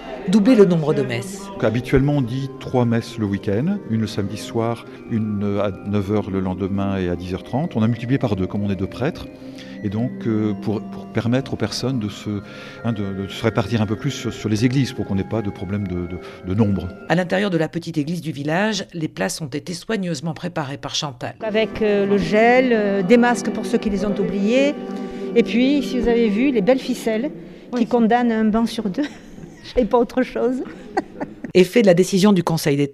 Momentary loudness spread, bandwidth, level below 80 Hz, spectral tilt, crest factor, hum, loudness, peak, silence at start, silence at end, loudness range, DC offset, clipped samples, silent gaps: 12 LU; 13.5 kHz; -46 dBFS; -6.5 dB/octave; 18 dB; none; -20 LUFS; -2 dBFS; 0 s; 0 s; 6 LU; under 0.1%; under 0.1%; none